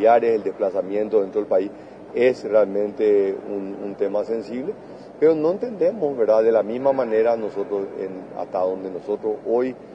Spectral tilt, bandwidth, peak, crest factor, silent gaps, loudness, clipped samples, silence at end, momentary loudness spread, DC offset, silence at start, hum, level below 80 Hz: -7.5 dB/octave; 7.8 kHz; -4 dBFS; 16 dB; none; -22 LUFS; under 0.1%; 0 s; 12 LU; under 0.1%; 0 s; none; -62 dBFS